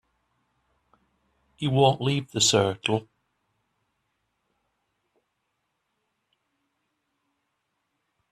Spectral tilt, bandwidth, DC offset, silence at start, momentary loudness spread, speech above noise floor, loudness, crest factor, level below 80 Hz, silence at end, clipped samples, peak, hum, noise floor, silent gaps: -4 dB/octave; 13.5 kHz; under 0.1%; 1.6 s; 8 LU; 55 dB; -23 LUFS; 24 dB; -64 dBFS; 5.3 s; under 0.1%; -6 dBFS; none; -78 dBFS; none